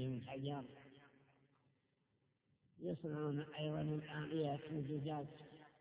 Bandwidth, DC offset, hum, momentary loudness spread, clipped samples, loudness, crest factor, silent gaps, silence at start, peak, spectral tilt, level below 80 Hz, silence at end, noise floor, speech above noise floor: 4 kHz; under 0.1%; none; 16 LU; under 0.1%; -45 LUFS; 16 dB; none; 0 s; -30 dBFS; -6.5 dB/octave; -76 dBFS; 0.1 s; -82 dBFS; 38 dB